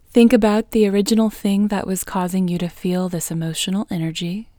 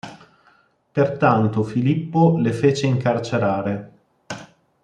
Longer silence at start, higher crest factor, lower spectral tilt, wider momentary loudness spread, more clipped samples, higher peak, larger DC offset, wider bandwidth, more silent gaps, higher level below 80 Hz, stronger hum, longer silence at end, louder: about the same, 0.15 s vs 0.05 s; about the same, 18 dB vs 18 dB; second, -5.5 dB/octave vs -7.5 dB/octave; second, 10 LU vs 18 LU; neither; about the same, 0 dBFS vs -2 dBFS; neither; first, over 20 kHz vs 9.8 kHz; neither; first, -46 dBFS vs -60 dBFS; neither; second, 0.15 s vs 0.4 s; about the same, -19 LUFS vs -20 LUFS